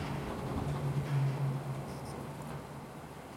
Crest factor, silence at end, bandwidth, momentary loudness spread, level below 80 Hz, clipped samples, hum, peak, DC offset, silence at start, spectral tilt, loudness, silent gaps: 14 dB; 0 s; 15.5 kHz; 13 LU; -54 dBFS; under 0.1%; none; -22 dBFS; under 0.1%; 0 s; -7 dB/octave; -38 LUFS; none